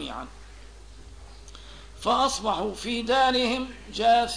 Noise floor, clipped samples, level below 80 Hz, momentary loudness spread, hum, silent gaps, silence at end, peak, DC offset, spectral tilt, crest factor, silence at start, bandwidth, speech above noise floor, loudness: -46 dBFS; under 0.1%; -46 dBFS; 24 LU; none; none; 0 s; -10 dBFS; 0.2%; -3 dB/octave; 16 dB; 0 s; 11 kHz; 21 dB; -25 LUFS